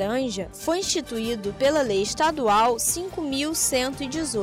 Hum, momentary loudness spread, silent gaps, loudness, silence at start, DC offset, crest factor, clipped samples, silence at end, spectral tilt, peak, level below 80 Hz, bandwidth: none; 8 LU; none; -24 LUFS; 0 s; under 0.1%; 12 dB; under 0.1%; 0 s; -2.5 dB/octave; -12 dBFS; -48 dBFS; 16 kHz